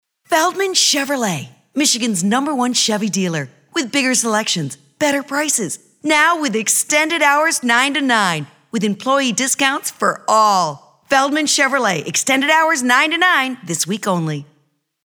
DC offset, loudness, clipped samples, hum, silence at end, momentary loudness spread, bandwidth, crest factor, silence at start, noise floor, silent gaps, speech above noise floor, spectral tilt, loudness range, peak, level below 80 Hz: under 0.1%; -16 LUFS; under 0.1%; none; 0.65 s; 9 LU; over 20 kHz; 16 dB; 0.3 s; -62 dBFS; none; 46 dB; -2.5 dB/octave; 3 LU; 0 dBFS; -72 dBFS